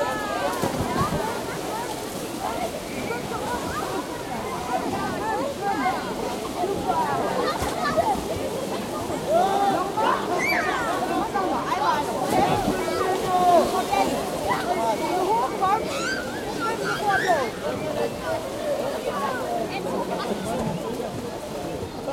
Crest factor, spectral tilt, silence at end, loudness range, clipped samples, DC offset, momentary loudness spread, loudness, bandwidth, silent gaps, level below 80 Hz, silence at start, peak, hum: 18 dB; -4.5 dB/octave; 0 s; 6 LU; under 0.1%; under 0.1%; 8 LU; -25 LUFS; 16.5 kHz; none; -48 dBFS; 0 s; -8 dBFS; none